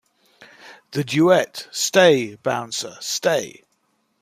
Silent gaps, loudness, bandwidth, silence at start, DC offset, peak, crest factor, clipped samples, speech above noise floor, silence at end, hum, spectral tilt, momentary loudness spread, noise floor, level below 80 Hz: none; -20 LUFS; 15.5 kHz; 0.65 s; under 0.1%; -2 dBFS; 20 dB; under 0.1%; 48 dB; 0.7 s; none; -3.5 dB/octave; 13 LU; -68 dBFS; -66 dBFS